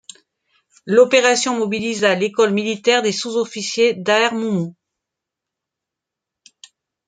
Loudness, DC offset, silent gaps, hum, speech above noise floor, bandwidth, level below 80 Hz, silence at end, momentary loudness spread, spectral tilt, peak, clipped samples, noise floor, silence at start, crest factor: -17 LUFS; under 0.1%; none; none; 67 dB; 9.4 kHz; -68 dBFS; 2.35 s; 9 LU; -3.5 dB/octave; -2 dBFS; under 0.1%; -84 dBFS; 0.85 s; 18 dB